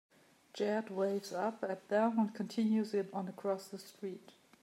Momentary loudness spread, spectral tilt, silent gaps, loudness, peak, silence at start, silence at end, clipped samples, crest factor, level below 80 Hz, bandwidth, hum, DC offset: 13 LU; -6 dB/octave; none; -37 LUFS; -20 dBFS; 0.55 s; 0.35 s; under 0.1%; 16 dB; under -90 dBFS; 15.5 kHz; none; under 0.1%